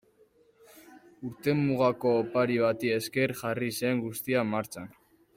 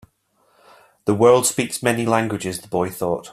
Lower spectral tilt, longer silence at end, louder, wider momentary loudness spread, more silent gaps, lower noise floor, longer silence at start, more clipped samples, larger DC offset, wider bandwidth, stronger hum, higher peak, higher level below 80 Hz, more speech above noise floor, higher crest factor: first, -6 dB/octave vs -4.5 dB/octave; first, 0.45 s vs 0 s; second, -28 LUFS vs -19 LUFS; first, 14 LU vs 11 LU; neither; about the same, -63 dBFS vs -63 dBFS; second, 0.75 s vs 1.05 s; neither; neither; about the same, 16.5 kHz vs 16 kHz; neither; second, -12 dBFS vs -2 dBFS; second, -68 dBFS vs -58 dBFS; second, 35 dB vs 44 dB; about the same, 18 dB vs 20 dB